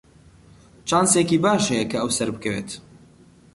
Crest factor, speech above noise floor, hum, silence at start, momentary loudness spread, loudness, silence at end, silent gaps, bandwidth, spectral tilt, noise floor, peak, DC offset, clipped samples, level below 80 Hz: 18 dB; 30 dB; none; 0.85 s; 16 LU; -21 LUFS; 0.75 s; none; 11.5 kHz; -4 dB/octave; -51 dBFS; -6 dBFS; under 0.1%; under 0.1%; -54 dBFS